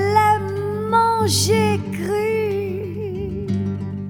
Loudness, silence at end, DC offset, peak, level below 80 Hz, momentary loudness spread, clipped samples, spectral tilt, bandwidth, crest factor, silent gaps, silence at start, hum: -20 LUFS; 0 s; under 0.1%; -4 dBFS; -46 dBFS; 10 LU; under 0.1%; -5 dB/octave; 19.5 kHz; 16 dB; none; 0 s; 50 Hz at -45 dBFS